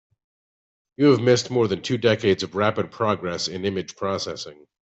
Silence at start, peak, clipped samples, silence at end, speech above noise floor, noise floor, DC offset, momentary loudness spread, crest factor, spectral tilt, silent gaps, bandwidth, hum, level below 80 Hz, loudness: 1 s; -6 dBFS; under 0.1%; 0.35 s; over 68 dB; under -90 dBFS; under 0.1%; 10 LU; 18 dB; -5 dB/octave; none; 8.2 kHz; none; -62 dBFS; -22 LUFS